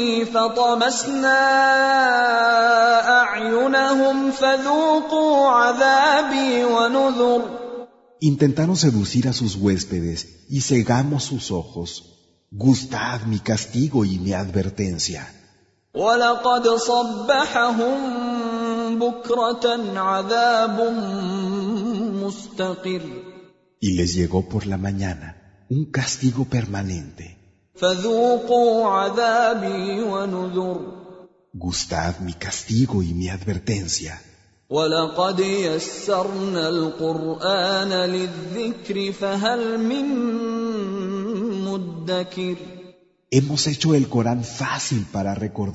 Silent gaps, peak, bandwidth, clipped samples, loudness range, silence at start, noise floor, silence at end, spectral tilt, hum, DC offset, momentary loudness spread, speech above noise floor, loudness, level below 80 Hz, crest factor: none; -4 dBFS; 8 kHz; under 0.1%; 8 LU; 0 s; -58 dBFS; 0 s; -5 dB/octave; none; under 0.1%; 12 LU; 38 dB; -20 LUFS; -50 dBFS; 18 dB